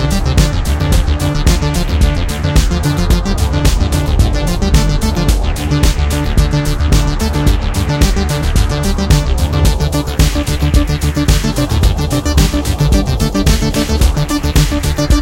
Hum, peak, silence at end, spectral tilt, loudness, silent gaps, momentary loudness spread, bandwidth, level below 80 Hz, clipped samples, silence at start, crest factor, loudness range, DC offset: none; 0 dBFS; 0 s; -5.5 dB/octave; -14 LUFS; none; 2 LU; 17 kHz; -14 dBFS; under 0.1%; 0 s; 12 dB; 1 LU; under 0.1%